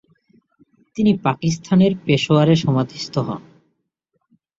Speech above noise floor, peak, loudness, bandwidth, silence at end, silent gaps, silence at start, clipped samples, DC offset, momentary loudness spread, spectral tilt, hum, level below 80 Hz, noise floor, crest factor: 55 dB; -2 dBFS; -18 LUFS; 7.8 kHz; 1.2 s; none; 0.95 s; under 0.1%; under 0.1%; 11 LU; -6.5 dB/octave; none; -54 dBFS; -72 dBFS; 18 dB